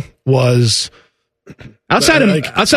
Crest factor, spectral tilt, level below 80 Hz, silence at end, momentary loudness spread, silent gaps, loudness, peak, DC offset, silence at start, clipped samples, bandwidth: 14 dB; -4.5 dB/octave; -44 dBFS; 0 s; 7 LU; none; -13 LUFS; 0 dBFS; under 0.1%; 0 s; under 0.1%; 14 kHz